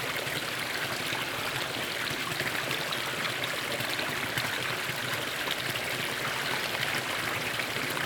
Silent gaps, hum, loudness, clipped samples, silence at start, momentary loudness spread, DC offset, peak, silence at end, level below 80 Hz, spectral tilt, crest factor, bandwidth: none; none; -30 LUFS; under 0.1%; 0 s; 1 LU; under 0.1%; -12 dBFS; 0 s; -62 dBFS; -2 dB/octave; 20 dB; over 20 kHz